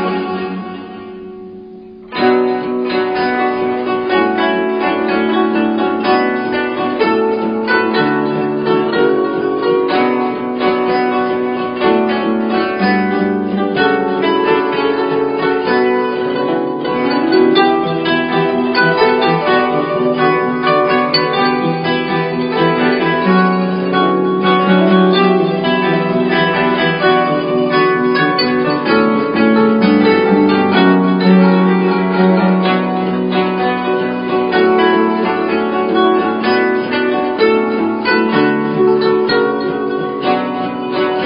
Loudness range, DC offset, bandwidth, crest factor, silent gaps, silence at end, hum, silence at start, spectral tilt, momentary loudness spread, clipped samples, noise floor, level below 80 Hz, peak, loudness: 3 LU; under 0.1%; 5.4 kHz; 14 dB; none; 0 s; none; 0 s; -10.5 dB/octave; 6 LU; under 0.1%; -33 dBFS; -52 dBFS; 0 dBFS; -14 LUFS